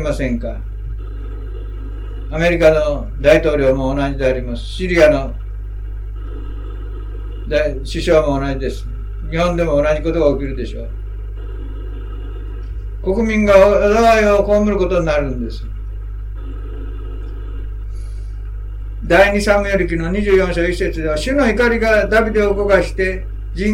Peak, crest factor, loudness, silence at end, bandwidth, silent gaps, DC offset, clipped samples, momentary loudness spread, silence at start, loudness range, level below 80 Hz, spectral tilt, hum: 0 dBFS; 16 dB; -15 LUFS; 0 s; 13 kHz; none; under 0.1%; under 0.1%; 17 LU; 0 s; 9 LU; -24 dBFS; -6 dB/octave; none